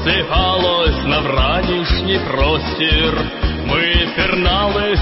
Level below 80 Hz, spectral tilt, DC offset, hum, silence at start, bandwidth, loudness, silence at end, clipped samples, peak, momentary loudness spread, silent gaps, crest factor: -22 dBFS; -8.5 dB/octave; under 0.1%; none; 0 s; 5.8 kHz; -15 LUFS; 0 s; under 0.1%; -2 dBFS; 3 LU; none; 12 dB